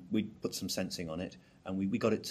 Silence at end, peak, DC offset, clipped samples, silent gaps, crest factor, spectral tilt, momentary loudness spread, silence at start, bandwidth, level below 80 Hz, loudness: 0 s; -16 dBFS; under 0.1%; under 0.1%; none; 20 dB; -5 dB/octave; 10 LU; 0 s; 15.5 kHz; -66 dBFS; -36 LUFS